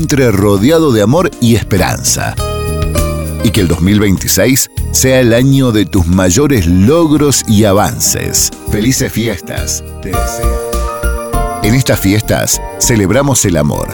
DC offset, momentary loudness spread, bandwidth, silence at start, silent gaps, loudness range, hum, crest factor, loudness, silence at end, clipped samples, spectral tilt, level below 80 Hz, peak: under 0.1%; 8 LU; over 20 kHz; 0 s; none; 5 LU; none; 10 dB; -11 LUFS; 0 s; under 0.1%; -4.5 dB/octave; -22 dBFS; 0 dBFS